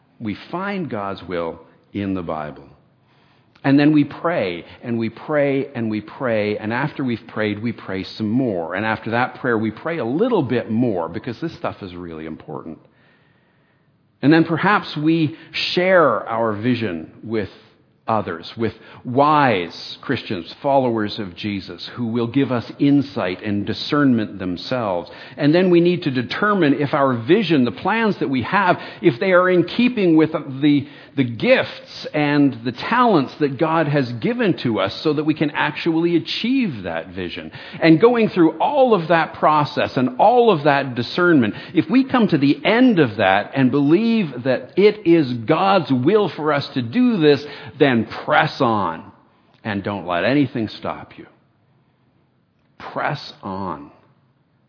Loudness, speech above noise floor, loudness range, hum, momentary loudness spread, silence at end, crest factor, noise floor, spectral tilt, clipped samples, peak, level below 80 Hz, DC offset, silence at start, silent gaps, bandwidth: -19 LUFS; 43 dB; 8 LU; none; 13 LU; 0.8 s; 20 dB; -61 dBFS; -8 dB/octave; under 0.1%; 0 dBFS; -60 dBFS; under 0.1%; 0.2 s; none; 5.4 kHz